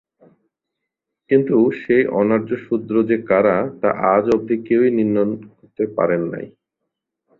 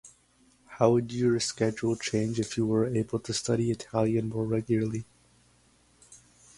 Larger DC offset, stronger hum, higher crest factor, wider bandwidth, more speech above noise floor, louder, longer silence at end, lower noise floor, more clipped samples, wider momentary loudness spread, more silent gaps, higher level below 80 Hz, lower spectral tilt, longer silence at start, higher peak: neither; second, none vs 60 Hz at -55 dBFS; second, 16 dB vs 22 dB; second, 6.8 kHz vs 11.5 kHz; first, 63 dB vs 36 dB; first, -18 LUFS vs -28 LUFS; first, 0.9 s vs 0.4 s; first, -81 dBFS vs -64 dBFS; neither; about the same, 8 LU vs 6 LU; neither; about the same, -58 dBFS vs -60 dBFS; first, -9.5 dB/octave vs -5.5 dB/octave; first, 1.3 s vs 0.05 s; first, -2 dBFS vs -8 dBFS